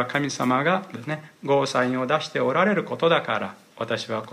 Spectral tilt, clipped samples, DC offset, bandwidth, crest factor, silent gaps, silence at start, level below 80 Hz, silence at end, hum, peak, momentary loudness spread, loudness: -5 dB/octave; under 0.1%; under 0.1%; 15.5 kHz; 16 dB; none; 0 s; -72 dBFS; 0 s; none; -6 dBFS; 11 LU; -24 LUFS